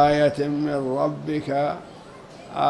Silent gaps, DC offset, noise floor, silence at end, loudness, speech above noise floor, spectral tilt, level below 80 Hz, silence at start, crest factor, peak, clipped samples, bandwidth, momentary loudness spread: none; under 0.1%; -43 dBFS; 0 s; -24 LUFS; 21 dB; -7 dB/octave; -54 dBFS; 0 s; 18 dB; -6 dBFS; under 0.1%; 11.5 kHz; 22 LU